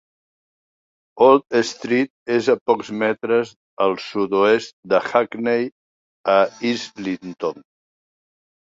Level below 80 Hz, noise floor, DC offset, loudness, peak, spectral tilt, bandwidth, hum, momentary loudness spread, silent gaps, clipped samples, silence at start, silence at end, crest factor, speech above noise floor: -66 dBFS; under -90 dBFS; under 0.1%; -20 LUFS; -2 dBFS; -5 dB/octave; 7.8 kHz; none; 11 LU; 2.10-2.26 s, 2.61-2.66 s, 3.56-3.77 s, 4.73-4.83 s, 5.72-6.24 s; under 0.1%; 1.15 s; 1.05 s; 20 dB; over 71 dB